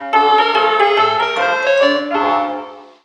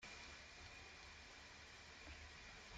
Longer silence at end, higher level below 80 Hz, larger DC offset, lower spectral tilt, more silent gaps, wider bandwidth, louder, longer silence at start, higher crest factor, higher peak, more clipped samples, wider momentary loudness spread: first, 0.2 s vs 0 s; first, -62 dBFS vs -68 dBFS; neither; about the same, -3 dB/octave vs -2.5 dB/octave; neither; about the same, 9.6 kHz vs 10 kHz; first, -14 LUFS vs -57 LUFS; about the same, 0 s vs 0 s; about the same, 14 dB vs 14 dB; first, 0 dBFS vs -44 dBFS; neither; first, 8 LU vs 2 LU